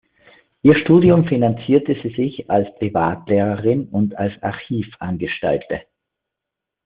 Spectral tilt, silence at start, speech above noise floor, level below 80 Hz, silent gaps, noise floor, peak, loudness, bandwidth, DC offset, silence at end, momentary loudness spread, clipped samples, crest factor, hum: -7 dB/octave; 0.65 s; 66 dB; -50 dBFS; none; -83 dBFS; 0 dBFS; -18 LUFS; 4.9 kHz; under 0.1%; 1.05 s; 13 LU; under 0.1%; 18 dB; none